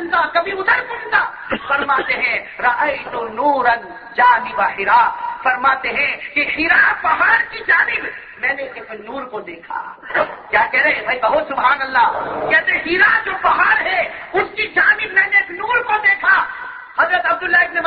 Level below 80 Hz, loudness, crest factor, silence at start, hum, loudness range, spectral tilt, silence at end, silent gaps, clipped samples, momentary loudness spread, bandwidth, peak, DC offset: -52 dBFS; -15 LUFS; 16 dB; 0 s; none; 4 LU; -6 dB/octave; 0 s; none; under 0.1%; 12 LU; 5.6 kHz; 0 dBFS; under 0.1%